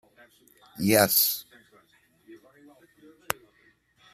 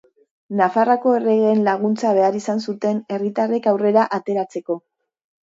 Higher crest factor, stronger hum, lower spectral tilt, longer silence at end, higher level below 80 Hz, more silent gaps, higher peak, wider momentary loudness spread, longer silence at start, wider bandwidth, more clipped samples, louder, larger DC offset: first, 30 dB vs 16 dB; neither; second, -3 dB/octave vs -6.5 dB/octave; first, 0.8 s vs 0.65 s; about the same, -68 dBFS vs -72 dBFS; neither; about the same, -2 dBFS vs -2 dBFS; first, 15 LU vs 8 LU; first, 0.8 s vs 0.5 s; first, 15 kHz vs 7.8 kHz; neither; second, -24 LUFS vs -19 LUFS; neither